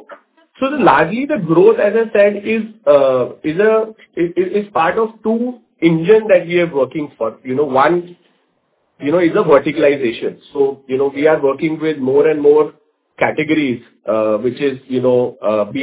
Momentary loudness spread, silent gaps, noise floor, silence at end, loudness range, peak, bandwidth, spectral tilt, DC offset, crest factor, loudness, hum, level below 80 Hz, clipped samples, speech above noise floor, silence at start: 9 LU; none; -63 dBFS; 0 s; 3 LU; 0 dBFS; 4 kHz; -10.5 dB/octave; under 0.1%; 14 dB; -15 LUFS; none; -56 dBFS; under 0.1%; 49 dB; 0.1 s